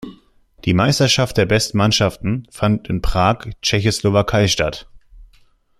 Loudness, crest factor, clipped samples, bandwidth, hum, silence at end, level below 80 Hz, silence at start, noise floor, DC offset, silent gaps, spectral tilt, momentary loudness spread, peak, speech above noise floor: -17 LUFS; 18 dB; under 0.1%; 14 kHz; none; 0.55 s; -34 dBFS; 0 s; -53 dBFS; under 0.1%; none; -4.5 dB/octave; 9 LU; 0 dBFS; 36 dB